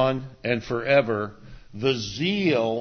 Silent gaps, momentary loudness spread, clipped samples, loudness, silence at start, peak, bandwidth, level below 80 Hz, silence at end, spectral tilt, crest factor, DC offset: none; 9 LU; under 0.1%; -24 LUFS; 0 s; -6 dBFS; 6.6 kHz; -54 dBFS; 0 s; -5.5 dB/octave; 18 dB; under 0.1%